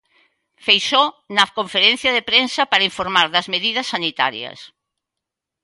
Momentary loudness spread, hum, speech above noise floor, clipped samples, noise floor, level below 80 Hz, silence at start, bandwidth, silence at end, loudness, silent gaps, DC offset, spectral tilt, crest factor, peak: 7 LU; none; 65 dB; under 0.1%; -83 dBFS; -60 dBFS; 0.65 s; 11.5 kHz; 1 s; -16 LUFS; none; under 0.1%; -2 dB/octave; 20 dB; 0 dBFS